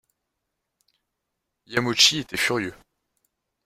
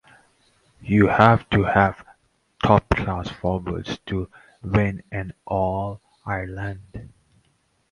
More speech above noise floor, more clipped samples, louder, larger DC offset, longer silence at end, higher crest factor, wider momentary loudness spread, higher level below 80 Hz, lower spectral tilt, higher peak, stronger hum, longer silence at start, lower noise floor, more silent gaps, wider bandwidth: first, 58 dB vs 44 dB; neither; about the same, -21 LUFS vs -22 LUFS; neither; about the same, 0.95 s vs 0.85 s; about the same, 24 dB vs 22 dB; second, 12 LU vs 21 LU; second, -62 dBFS vs -40 dBFS; second, -2 dB/octave vs -8 dB/octave; second, -4 dBFS vs 0 dBFS; neither; first, 1.7 s vs 0.85 s; first, -81 dBFS vs -66 dBFS; neither; first, 16 kHz vs 10.5 kHz